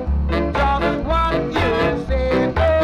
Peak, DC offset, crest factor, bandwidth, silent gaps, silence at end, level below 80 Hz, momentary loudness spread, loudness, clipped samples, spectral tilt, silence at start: -6 dBFS; under 0.1%; 12 dB; 9.2 kHz; none; 0 s; -24 dBFS; 3 LU; -19 LUFS; under 0.1%; -7.5 dB/octave; 0 s